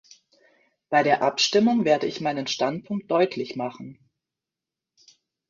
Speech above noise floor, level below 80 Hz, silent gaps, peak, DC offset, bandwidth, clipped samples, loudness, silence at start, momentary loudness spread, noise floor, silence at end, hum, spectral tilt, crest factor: 65 dB; -70 dBFS; none; -6 dBFS; under 0.1%; 7.6 kHz; under 0.1%; -23 LUFS; 0.9 s; 12 LU; -88 dBFS; 1.55 s; none; -4 dB/octave; 20 dB